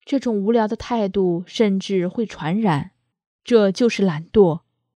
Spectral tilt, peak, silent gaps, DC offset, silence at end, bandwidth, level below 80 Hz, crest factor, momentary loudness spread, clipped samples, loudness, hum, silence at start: -6.5 dB/octave; -2 dBFS; 3.27-3.39 s; under 0.1%; 0.4 s; 10 kHz; -50 dBFS; 18 dB; 8 LU; under 0.1%; -20 LUFS; none; 0.1 s